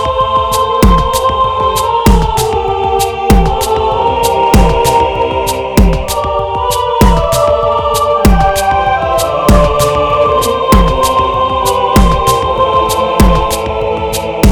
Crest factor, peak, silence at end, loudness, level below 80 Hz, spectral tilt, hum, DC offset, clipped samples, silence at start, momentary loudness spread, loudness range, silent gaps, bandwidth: 10 dB; 0 dBFS; 0 s; -11 LUFS; -16 dBFS; -5 dB/octave; none; under 0.1%; 0.8%; 0 s; 4 LU; 1 LU; none; 19.5 kHz